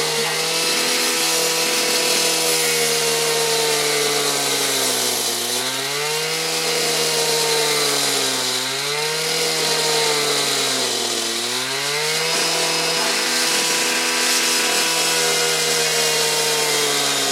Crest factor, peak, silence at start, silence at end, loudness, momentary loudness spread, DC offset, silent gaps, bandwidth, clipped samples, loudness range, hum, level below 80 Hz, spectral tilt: 16 dB; -4 dBFS; 0 s; 0 s; -17 LUFS; 4 LU; under 0.1%; none; 16 kHz; under 0.1%; 2 LU; none; -78 dBFS; -0.5 dB/octave